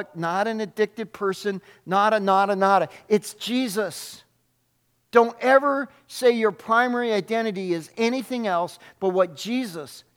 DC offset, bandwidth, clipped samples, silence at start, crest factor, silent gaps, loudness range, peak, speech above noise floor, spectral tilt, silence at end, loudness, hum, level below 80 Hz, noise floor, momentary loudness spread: under 0.1%; 17.5 kHz; under 0.1%; 0 s; 22 dB; none; 2 LU; -2 dBFS; 46 dB; -4.5 dB/octave; 0.15 s; -23 LUFS; none; -76 dBFS; -69 dBFS; 10 LU